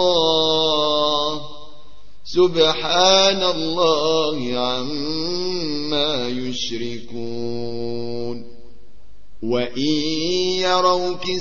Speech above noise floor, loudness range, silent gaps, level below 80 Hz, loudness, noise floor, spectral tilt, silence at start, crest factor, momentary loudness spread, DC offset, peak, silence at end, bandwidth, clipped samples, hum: 31 dB; 9 LU; none; -50 dBFS; -19 LUFS; -51 dBFS; -3.5 dB/octave; 0 s; 18 dB; 12 LU; 4%; -2 dBFS; 0 s; 7.2 kHz; under 0.1%; none